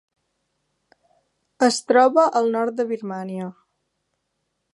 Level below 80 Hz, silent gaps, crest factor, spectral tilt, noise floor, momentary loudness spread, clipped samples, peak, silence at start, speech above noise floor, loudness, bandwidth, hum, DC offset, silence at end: -78 dBFS; none; 20 dB; -4 dB/octave; -75 dBFS; 15 LU; under 0.1%; -2 dBFS; 1.6 s; 56 dB; -20 LUFS; 11.5 kHz; none; under 0.1%; 1.2 s